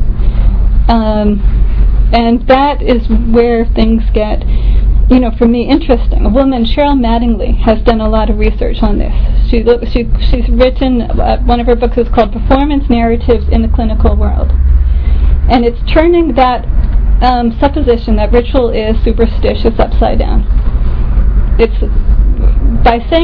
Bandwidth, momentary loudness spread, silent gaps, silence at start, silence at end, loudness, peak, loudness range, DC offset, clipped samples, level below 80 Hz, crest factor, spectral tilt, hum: 5 kHz; 4 LU; none; 0 s; 0 s; -11 LUFS; 0 dBFS; 2 LU; under 0.1%; 0.8%; -10 dBFS; 8 dB; -10 dB/octave; none